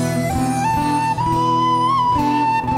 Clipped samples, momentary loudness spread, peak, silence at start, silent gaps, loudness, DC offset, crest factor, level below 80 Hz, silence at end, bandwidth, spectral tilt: under 0.1%; 3 LU; -8 dBFS; 0 s; none; -17 LUFS; under 0.1%; 10 dB; -38 dBFS; 0 s; 16.5 kHz; -5.5 dB/octave